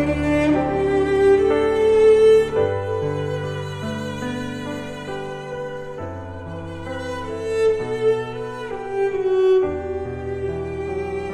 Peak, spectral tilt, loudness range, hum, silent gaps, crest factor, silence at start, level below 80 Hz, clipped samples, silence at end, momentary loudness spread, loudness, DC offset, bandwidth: -6 dBFS; -7 dB/octave; 12 LU; none; none; 14 dB; 0 s; -42 dBFS; under 0.1%; 0 s; 15 LU; -21 LUFS; under 0.1%; 10.5 kHz